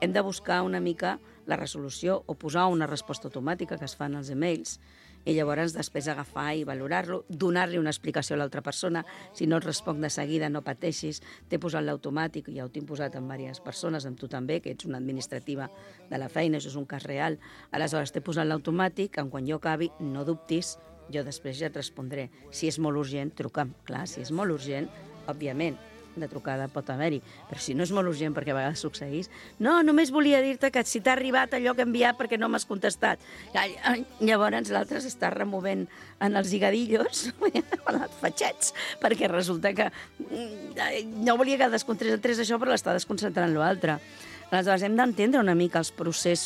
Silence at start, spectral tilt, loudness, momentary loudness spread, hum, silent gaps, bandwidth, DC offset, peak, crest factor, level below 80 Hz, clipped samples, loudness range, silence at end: 0 s; -4.5 dB/octave; -29 LUFS; 13 LU; none; none; 15.5 kHz; under 0.1%; -8 dBFS; 20 dB; -64 dBFS; under 0.1%; 8 LU; 0 s